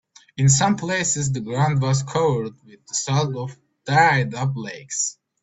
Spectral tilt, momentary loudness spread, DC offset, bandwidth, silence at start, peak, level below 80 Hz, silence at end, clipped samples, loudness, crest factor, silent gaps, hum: -4.5 dB/octave; 15 LU; under 0.1%; 8.4 kHz; 0.35 s; -4 dBFS; -54 dBFS; 0.3 s; under 0.1%; -21 LUFS; 18 dB; none; none